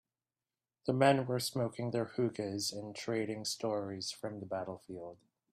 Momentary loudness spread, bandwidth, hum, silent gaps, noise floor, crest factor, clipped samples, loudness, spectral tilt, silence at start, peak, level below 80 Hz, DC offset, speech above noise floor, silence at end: 15 LU; 15.5 kHz; none; none; under -90 dBFS; 24 dB; under 0.1%; -36 LUFS; -5 dB/octave; 0.85 s; -14 dBFS; -76 dBFS; under 0.1%; over 54 dB; 0.35 s